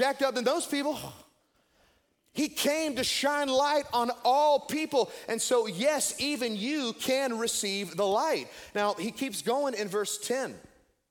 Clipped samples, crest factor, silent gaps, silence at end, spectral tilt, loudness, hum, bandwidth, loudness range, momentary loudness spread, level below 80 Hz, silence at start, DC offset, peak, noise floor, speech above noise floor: under 0.1%; 18 dB; none; 0.5 s; -2.5 dB/octave; -29 LUFS; none; 17.5 kHz; 4 LU; 7 LU; -68 dBFS; 0 s; under 0.1%; -12 dBFS; -69 dBFS; 40 dB